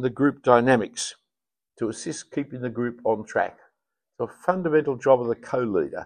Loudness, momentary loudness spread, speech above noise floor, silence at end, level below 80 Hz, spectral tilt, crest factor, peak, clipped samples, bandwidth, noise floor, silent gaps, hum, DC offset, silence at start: -24 LUFS; 13 LU; 66 dB; 0 s; -62 dBFS; -5.5 dB/octave; 24 dB; -2 dBFS; under 0.1%; 10 kHz; -89 dBFS; none; none; under 0.1%; 0 s